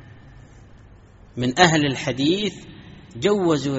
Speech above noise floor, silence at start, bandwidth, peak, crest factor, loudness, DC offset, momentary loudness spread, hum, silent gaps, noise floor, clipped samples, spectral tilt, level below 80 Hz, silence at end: 27 dB; 0.25 s; 8 kHz; 0 dBFS; 22 dB; -20 LUFS; under 0.1%; 24 LU; none; none; -47 dBFS; under 0.1%; -4 dB/octave; -50 dBFS; 0 s